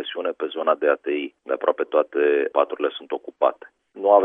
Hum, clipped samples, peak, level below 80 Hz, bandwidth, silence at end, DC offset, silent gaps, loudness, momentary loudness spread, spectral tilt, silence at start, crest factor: none; under 0.1%; -2 dBFS; -82 dBFS; 3.8 kHz; 0 s; under 0.1%; none; -23 LUFS; 8 LU; -6 dB/octave; 0 s; 20 dB